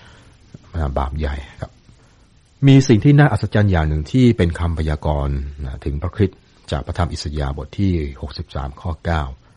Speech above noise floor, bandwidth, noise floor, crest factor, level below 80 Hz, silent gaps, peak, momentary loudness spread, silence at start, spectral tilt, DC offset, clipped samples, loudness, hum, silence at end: 34 dB; 10 kHz; -51 dBFS; 16 dB; -28 dBFS; none; -2 dBFS; 16 LU; 0.75 s; -7.5 dB/octave; under 0.1%; under 0.1%; -19 LUFS; none; 0.2 s